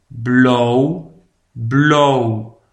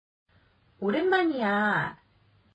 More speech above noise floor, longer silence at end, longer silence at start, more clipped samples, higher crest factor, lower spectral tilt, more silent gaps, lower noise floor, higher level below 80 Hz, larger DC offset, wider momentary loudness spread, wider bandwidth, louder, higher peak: second, 34 dB vs 38 dB; second, 0.25 s vs 0.6 s; second, 0.15 s vs 0.8 s; neither; about the same, 14 dB vs 16 dB; about the same, -6.5 dB/octave vs -7 dB/octave; neither; second, -48 dBFS vs -64 dBFS; first, -54 dBFS vs -68 dBFS; neither; first, 14 LU vs 8 LU; about the same, 8.4 kHz vs 8.2 kHz; first, -14 LUFS vs -26 LUFS; first, 0 dBFS vs -12 dBFS